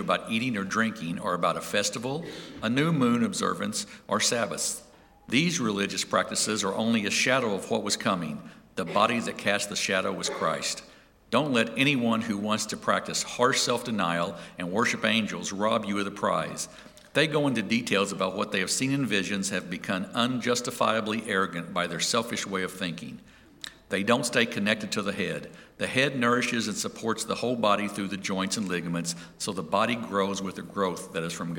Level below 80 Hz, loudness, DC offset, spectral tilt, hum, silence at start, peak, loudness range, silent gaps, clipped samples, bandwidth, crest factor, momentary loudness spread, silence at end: -64 dBFS; -27 LUFS; under 0.1%; -3.5 dB/octave; none; 0 s; -6 dBFS; 2 LU; none; under 0.1%; 18 kHz; 22 dB; 9 LU; 0 s